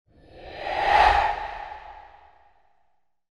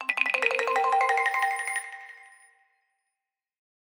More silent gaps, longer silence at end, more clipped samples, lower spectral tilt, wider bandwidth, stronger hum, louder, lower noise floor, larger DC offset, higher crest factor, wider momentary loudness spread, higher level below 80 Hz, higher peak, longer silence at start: neither; second, 1.3 s vs 1.7 s; neither; first, -3.5 dB/octave vs 1.5 dB/octave; second, 11 kHz vs 17.5 kHz; neither; first, -22 LUFS vs -25 LUFS; second, -71 dBFS vs -87 dBFS; neither; about the same, 22 dB vs 22 dB; first, 24 LU vs 17 LU; first, -42 dBFS vs under -90 dBFS; about the same, -6 dBFS vs -8 dBFS; first, 0.35 s vs 0 s